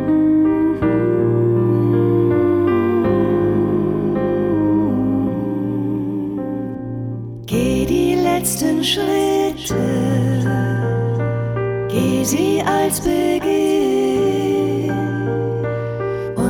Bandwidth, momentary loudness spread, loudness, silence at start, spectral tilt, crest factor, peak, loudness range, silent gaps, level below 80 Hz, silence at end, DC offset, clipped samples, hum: 18.5 kHz; 7 LU; -18 LUFS; 0 s; -6 dB/octave; 12 dB; -4 dBFS; 4 LU; none; -40 dBFS; 0 s; under 0.1%; under 0.1%; none